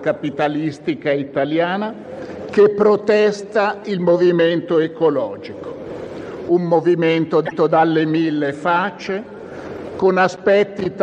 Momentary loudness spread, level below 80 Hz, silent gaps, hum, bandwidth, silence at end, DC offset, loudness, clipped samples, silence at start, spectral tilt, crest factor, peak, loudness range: 16 LU; -58 dBFS; none; none; 8.8 kHz; 0 s; under 0.1%; -17 LUFS; under 0.1%; 0 s; -7 dB/octave; 14 dB; -4 dBFS; 2 LU